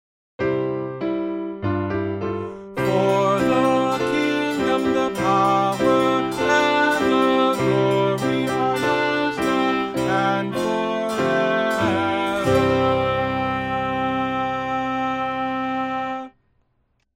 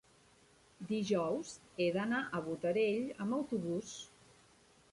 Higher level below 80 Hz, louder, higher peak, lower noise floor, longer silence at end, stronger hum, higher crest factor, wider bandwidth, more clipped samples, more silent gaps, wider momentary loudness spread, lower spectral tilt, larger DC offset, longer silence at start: first, -50 dBFS vs -72 dBFS; first, -21 LUFS vs -37 LUFS; first, -6 dBFS vs -22 dBFS; about the same, -67 dBFS vs -66 dBFS; about the same, 0.85 s vs 0.85 s; neither; about the same, 14 dB vs 16 dB; first, 16 kHz vs 11.5 kHz; neither; neither; second, 8 LU vs 14 LU; about the same, -5.5 dB/octave vs -5.5 dB/octave; neither; second, 0.4 s vs 0.8 s